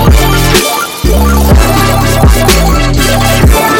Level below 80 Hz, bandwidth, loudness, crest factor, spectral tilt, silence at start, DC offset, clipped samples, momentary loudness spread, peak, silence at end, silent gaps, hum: -10 dBFS; 17.5 kHz; -7 LUFS; 6 dB; -4.5 dB/octave; 0 s; 0.6%; 0.4%; 3 LU; 0 dBFS; 0 s; none; none